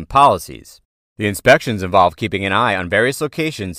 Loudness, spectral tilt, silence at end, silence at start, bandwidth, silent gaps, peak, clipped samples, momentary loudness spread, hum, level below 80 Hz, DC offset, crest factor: -16 LUFS; -4.5 dB/octave; 0 s; 0 s; 16 kHz; 0.85-1.16 s; 0 dBFS; under 0.1%; 10 LU; none; -44 dBFS; under 0.1%; 16 dB